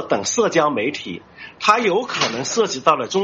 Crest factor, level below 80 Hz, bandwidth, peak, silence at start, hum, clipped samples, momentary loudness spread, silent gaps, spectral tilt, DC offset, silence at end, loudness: 20 dB; -62 dBFS; 8.2 kHz; 0 dBFS; 0 s; none; under 0.1%; 14 LU; none; -3 dB/octave; under 0.1%; 0 s; -18 LUFS